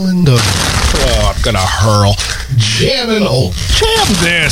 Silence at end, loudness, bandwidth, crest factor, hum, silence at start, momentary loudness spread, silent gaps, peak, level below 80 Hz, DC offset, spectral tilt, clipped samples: 0 s; -11 LUFS; 16.5 kHz; 12 dB; none; 0 s; 3 LU; none; 0 dBFS; -20 dBFS; under 0.1%; -4 dB/octave; under 0.1%